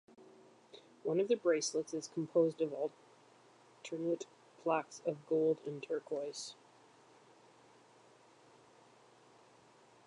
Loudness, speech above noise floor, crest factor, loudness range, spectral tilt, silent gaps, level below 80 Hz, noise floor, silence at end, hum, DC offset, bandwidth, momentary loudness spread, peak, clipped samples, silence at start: -37 LUFS; 28 dB; 20 dB; 10 LU; -4.5 dB/octave; none; under -90 dBFS; -64 dBFS; 3.55 s; none; under 0.1%; 10.5 kHz; 18 LU; -20 dBFS; under 0.1%; 0.2 s